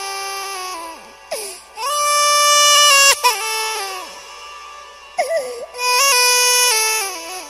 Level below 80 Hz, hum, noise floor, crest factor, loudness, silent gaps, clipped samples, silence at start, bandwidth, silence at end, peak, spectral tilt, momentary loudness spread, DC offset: -60 dBFS; none; -38 dBFS; 18 dB; -13 LUFS; none; under 0.1%; 0 s; 16 kHz; 0 s; 0 dBFS; 3.5 dB/octave; 22 LU; under 0.1%